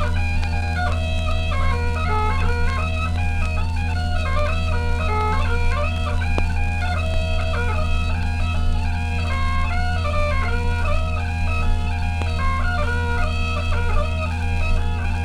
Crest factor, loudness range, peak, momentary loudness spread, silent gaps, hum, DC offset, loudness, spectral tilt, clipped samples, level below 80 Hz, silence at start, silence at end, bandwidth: 14 dB; 1 LU; -6 dBFS; 2 LU; none; none; under 0.1%; -23 LUFS; -6 dB/octave; under 0.1%; -22 dBFS; 0 s; 0 s; 10.5 kHz